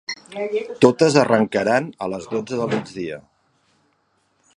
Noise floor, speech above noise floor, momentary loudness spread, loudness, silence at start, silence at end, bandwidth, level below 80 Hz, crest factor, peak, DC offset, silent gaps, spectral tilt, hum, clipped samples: -66 dBFS; 46 dB; 15 LU; -20 LUFS; 0.1 s; 1.35 s; 11 kHz; -60 dBFS; 22 dB; 0 dBFS; under 0.1%; none; -5.5 dB/octave; none; under 0.1%